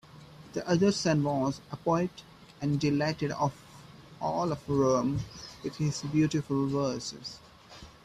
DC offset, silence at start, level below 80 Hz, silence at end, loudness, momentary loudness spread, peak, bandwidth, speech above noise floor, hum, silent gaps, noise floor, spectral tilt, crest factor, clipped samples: under 0.1%; 0.15 s; -58 dBFS; 0.15 s; -30 LUFS; 16 LU; -14 dBFS; 13 kHz; 22 dB; none; none; -51 dBFS; -6 dB/octave; 16 dB; under 0.1%